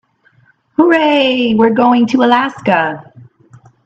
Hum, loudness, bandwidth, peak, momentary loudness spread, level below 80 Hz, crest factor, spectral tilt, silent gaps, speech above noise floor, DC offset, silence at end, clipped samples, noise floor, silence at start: none; -12 LUFS; 7.8 kHz; 0 dBFS; 7 LU; -58 dBFS; 14 dB; -6 dB/octave; none; 41 dB; under 0.1%; 0.6 s; under 0.1%; -52 dBFS; 0.8 s